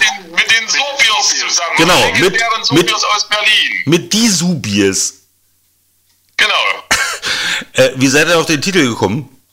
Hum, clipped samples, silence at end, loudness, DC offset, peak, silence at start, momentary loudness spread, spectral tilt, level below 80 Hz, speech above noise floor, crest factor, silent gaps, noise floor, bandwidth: none; under 0.1%; 0.3 s; -11 LUFS; under 0.1%; 0 dBFS; 0 s; 6 LU; -2.5 dB/octave; -46 dBFS; 44 dB; 14 dB; none; -57 dBFS; 16.5 kHz